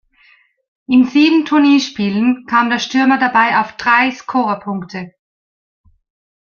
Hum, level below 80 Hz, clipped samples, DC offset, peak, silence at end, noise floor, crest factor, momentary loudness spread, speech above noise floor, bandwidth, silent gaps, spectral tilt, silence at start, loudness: none; -60 dBFS; under 0.1%; under 0.1%; -2 dBFS; 1.5 s; -52 dBFS; 14 dB; 12 LU; 38 dB; 7 kHz; none; -4.5 dB/octave; 0.9 s; -14 LUFS